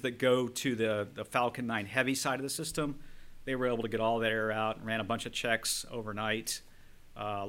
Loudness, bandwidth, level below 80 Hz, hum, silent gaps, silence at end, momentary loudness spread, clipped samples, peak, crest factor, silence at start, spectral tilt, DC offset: -33 LUFS; 17 kHz; -56 dBFS; none; none; 0 s; 9 LU; under 0.1%; -12 dBFS; 22 dB; 0 s; -3.5 dB/octave; under 0.1%